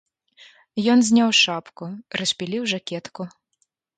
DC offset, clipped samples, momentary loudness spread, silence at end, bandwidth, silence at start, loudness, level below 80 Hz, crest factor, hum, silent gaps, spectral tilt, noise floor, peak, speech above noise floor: under 0.1%; under 0.1%; 20 LU; 0.7 s; 9.4 kHz; 0.75 s; -20 LUFS; -70 dBFS; 20 dB; none; none; -3 dB/octave; -71 dBFS; -4 dBFS; 50 dB